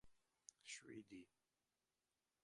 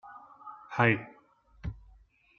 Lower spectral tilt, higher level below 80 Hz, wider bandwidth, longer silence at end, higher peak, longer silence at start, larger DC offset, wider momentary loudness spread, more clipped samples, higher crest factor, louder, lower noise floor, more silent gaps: second, -2.5 dB/octave vs -5 dB/octave; second, -90 dBFS vs -54 dBFS; first, 11 kHz vs 6.8 kHz; first, 1.15 s vs 0.6 s; second, -38 dBFS vs -8 dBFS; about the same, 0.05 s vs 0.05 s; neither; second, 11 LU vs 25 LU; neither; about the same, 26 dB vs 26 dB; second, -59 LUFS vs -28 LUFS; first, under -90 dBFS vs -62 dBFS; neither